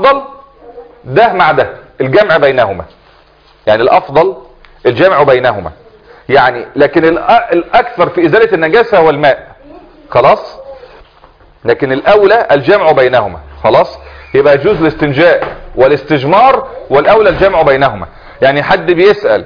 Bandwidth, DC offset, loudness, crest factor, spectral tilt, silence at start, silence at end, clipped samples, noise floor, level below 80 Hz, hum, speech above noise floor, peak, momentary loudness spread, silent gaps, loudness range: 5.4 kHz; 0.2%; -9 LUFS; 10 dB; -7.5 dB/octave; 0 s; 0 s; 1%; -44 dBFS; -38 dBFS; none; 36 dB; 0 dBFS; 9 LU; none; 3 LU